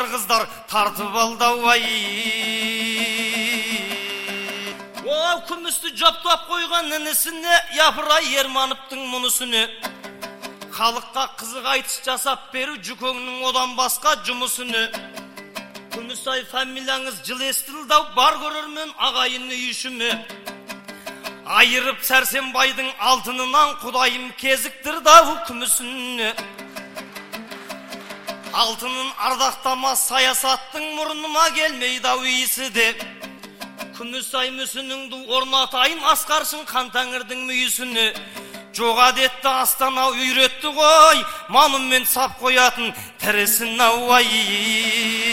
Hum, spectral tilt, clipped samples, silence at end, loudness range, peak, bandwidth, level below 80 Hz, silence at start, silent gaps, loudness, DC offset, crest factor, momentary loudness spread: none; 0 dB/octave; under 0.1%; 0 s; 8 LU; 0 dBFS; 16.5 kHz; -58 dBFS; 0 s; none; -19 LUFS; under 0.1%; 20 dB; 18 LU